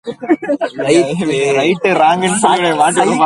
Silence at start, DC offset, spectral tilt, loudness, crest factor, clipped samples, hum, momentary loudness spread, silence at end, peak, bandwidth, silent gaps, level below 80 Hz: 0.05 s; under 0.1%; -4 dB/octave; -13 LUFS; 12 dB; under 0.1%; none; 6 LU; 0 s; 0 dBFS; 11.5 kHz; none; -54 dBFS